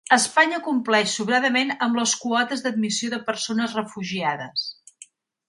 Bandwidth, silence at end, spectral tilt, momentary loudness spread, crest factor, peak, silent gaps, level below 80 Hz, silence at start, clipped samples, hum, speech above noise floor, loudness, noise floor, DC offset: 11.5 kHz; 0.75 s; -2.5 dB/octave; 9 LU; 20 dB; -4 dBFS; none; -72 dBFS; 0.1 s; under 0.1%; none; 28 dB; -22 LUFS; -51 dBFS; under 0.1%